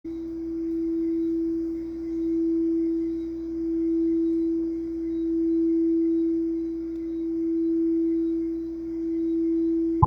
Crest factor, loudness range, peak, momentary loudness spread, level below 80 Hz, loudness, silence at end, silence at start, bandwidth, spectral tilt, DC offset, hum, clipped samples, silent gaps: 22 dB; 2 LU; -2 dBFS; 8 LU; -52 dBFS; -26 LUFS; 0 s; 0.05 s; 2.3 kHz; -11 dB/octave; under 0.1%; 60 Hz at -60 dBFS; under 0.1%; none